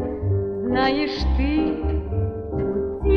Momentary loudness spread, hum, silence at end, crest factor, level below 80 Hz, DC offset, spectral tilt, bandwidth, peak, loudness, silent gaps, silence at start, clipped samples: 5 LU; none; 0 s; 14 dB; -28 dBFS; under 0.1%; -8 dB/octave; 6.4 kHz; -8 dBFS; -23 LUFS; none; 0 s; under 0.1%